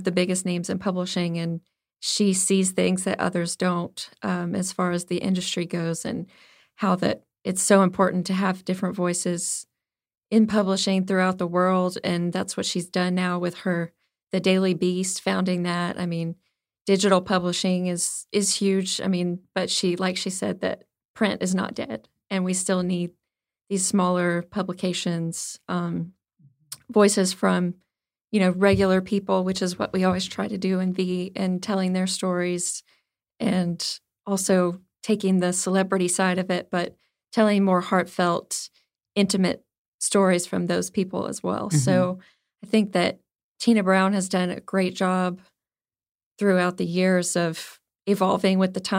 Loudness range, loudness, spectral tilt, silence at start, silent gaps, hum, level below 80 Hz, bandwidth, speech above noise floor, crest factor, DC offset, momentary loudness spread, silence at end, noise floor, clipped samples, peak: 3 LU; -24 LUFS; -4.5 dB/octave; 0 s; 21.05-21.14 s, 28.21-28.25 s, 39.78-39.99 s, 43.43-43.55 s, 46.11-46.15 s, 46.26-46.31 s; none; -62 dBFS; 16 kHz; over 67 dB; 20 dB; under 0.1%; 10 LU; 0 s; under -90 dBFS; under 0.1%; -4 dBFS